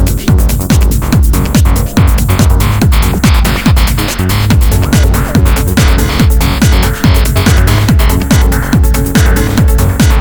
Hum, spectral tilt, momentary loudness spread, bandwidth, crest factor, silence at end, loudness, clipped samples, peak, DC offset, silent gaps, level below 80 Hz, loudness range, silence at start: none; -5.5 dB/octave; 1 LU; over 20 kHz; 8 dB; 0 s; -9 LUFS; 0.4%; 0 dBFS; under 0.1%; none; -10 dBFS; 1 LU; 0 s